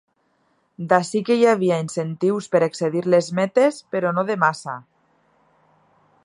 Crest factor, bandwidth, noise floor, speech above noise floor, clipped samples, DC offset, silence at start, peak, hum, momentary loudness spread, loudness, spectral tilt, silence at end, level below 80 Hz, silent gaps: 20 dB; 11.5 kHz; -66 dBFS; 46 dB; under 0.1%; under 0.1%; 0.8 s; 0 dBFS; none; 9 LU; -20 LUFS; -6 dB/octave; 1.45 s; -72 dBFS; none